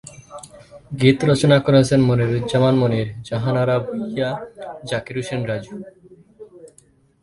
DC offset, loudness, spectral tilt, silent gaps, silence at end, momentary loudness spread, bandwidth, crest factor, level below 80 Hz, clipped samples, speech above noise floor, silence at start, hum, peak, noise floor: under 0.1%; -19 LUFS; -6.5 dB/octave; none; 0.55 s; 21 LU; 11.5 kHz; 20 dB; -50 dBFS; under 0.1%; 37 dB; 0.05 s; none; 0 dBFS; -55 dBFS